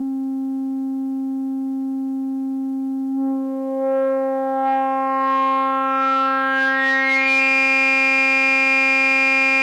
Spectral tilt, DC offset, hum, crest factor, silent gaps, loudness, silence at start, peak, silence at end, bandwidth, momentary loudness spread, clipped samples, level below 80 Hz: -2.5 dB/octave; under 0.1%; none; 12 dB; none; -18 LUFS; 0 s; -6 dBFS; 0 s; 10 kHz; 11 LU; under 0.1%; under -90 dBFS